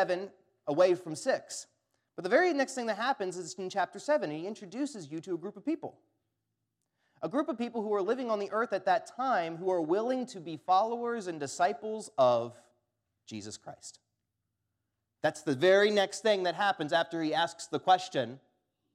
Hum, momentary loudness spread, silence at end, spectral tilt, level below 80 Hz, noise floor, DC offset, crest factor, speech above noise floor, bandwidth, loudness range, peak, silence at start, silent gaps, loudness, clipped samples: none; 15 LU; 0.55 s; -4 dB/octave; -86 dBFS; -84 dBFS; under 0.1%; 20 dB; 54 dB; 13.5 kHz; 8 LU; -12 dBFS; 0 s; none; -31 LUFS; under 0.1%